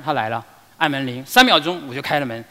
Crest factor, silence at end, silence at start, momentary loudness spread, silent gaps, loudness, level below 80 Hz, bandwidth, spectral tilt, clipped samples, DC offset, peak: 20 dB; 0.05 s; 0 s; 13 LU; none; -18 LUFS; -52 dBFS; 16 kHz; -3.5 dB/octave; under 0.1%; under 0.1%; 0 dBFS